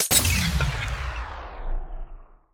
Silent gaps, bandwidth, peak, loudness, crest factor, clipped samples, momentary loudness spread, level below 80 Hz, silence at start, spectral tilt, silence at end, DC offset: none; 19.5 kHz; -4 dBFS; -24 LUFS; 22 dB; under 0.1%; 20 LU; -32 dBFS; 0 s; -2.5 dB/octave; 0.2 s; under 0.1%